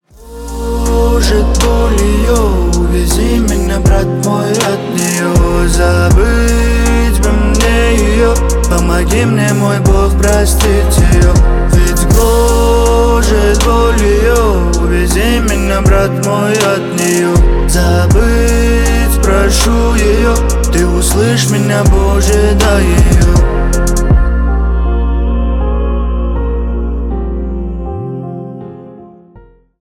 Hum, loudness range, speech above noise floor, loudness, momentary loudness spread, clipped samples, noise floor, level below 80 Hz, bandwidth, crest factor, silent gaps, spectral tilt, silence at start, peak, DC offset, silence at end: none; 5 LU; 32 dB; -11 LUFS; 7 LU; under 0.1%; -40 dBFS; -12 dBFS; 16.5 kHz; 10 dB; none; -5.5 dB/octave; 0.2 s; 0 dBFS; under 0.1%; 0.75 s